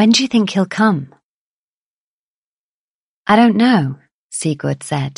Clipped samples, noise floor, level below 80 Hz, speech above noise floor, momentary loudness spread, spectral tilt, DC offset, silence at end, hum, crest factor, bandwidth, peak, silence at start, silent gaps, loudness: under 0.1%; under -90 dBFS; -60 dBFS; over 76 dB; 13 LU; -5 dB/octave; under 0.1%; 0.05 s; none; 16 dB; 11.5 kHz; 0 dBFS; 0 s; 1.23-3.25 s, 4.14-4.30 s; -15 LUFS